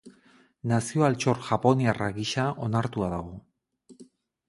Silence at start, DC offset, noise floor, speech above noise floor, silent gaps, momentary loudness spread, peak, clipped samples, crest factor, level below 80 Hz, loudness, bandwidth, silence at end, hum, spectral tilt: 0.05 s; under 0.1%; -60 dBFS; 34 dB; none; 12 LU; -6 dBFS; under 0.1%; 22 dB; -54 dBFS; -27 LUFS; 11.5 kHz; 0.45 s; none; -6 dB/octave